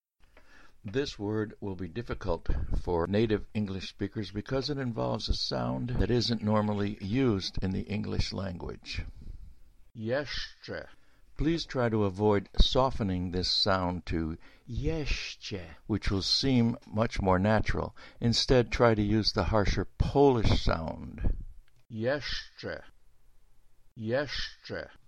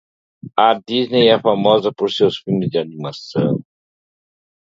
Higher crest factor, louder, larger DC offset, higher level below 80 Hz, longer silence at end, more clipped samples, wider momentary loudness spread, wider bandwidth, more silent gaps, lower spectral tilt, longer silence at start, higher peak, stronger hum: about the same, 22 dB vs 18 dB; second, -30 LUFS vs -17 LUFS; first, 0.1% vs under 0.1%; first, -38 dBFS vs -60 dBFS; second, 0.2 s vs 1.15 s; neither; first, 14 LU vs 11 LU; first, 10.5 kHz vs 7.6 kHz; neither; about the same, -6 dB/octave vs -7 dB/octave; first, 0.85 s vs 0.45 s; second, -8 dBFS vs 0 dBFS; neither